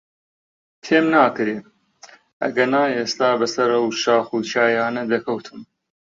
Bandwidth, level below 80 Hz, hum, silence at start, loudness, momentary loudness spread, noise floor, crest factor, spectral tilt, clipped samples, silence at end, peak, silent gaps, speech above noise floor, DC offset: 7.6 kHz; -68 dBFS; none; 0.85 s; -19 LUFS; 11 LU; -48 dBFS; 18 dB; -4 dB/octave; under 0.1%; 0.5 s; -2 dBFS; 2.33-2.40 s; 29 dB; under 0.1%